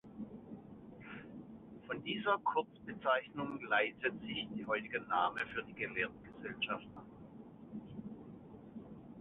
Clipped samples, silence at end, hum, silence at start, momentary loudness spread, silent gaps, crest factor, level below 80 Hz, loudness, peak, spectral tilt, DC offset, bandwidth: under 0.1%; 0 s; none; 0.05 s; 19 LU; none; 22 dB; -70 dBFS; -38 LUFS; -18 dBFS; -2 dB/octave; under 0.1%; 4 kHz